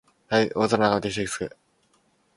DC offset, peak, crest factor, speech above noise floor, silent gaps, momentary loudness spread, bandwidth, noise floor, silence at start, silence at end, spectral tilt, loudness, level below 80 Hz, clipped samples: under 0.1%; -4 dBFS; 22 dB; 42 dB; none; 10 LU; 11.5 kHz; -66 dBFS; 0.3 s; 0.9 s; -4.5 dB/octave; -24 LUFS; -56 dBFS; under 0.1%